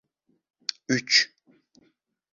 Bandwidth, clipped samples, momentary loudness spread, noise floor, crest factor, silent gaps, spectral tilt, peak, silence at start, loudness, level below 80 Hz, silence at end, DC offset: 7.6 kHz; under 0.1%; 14 LU; -68 dBFS; 24 dB; none; -2 dB/octave; -6 dBFS; 0.9 s; -24 LUFS; -76 dBFS; 1.05 s; under 0.1%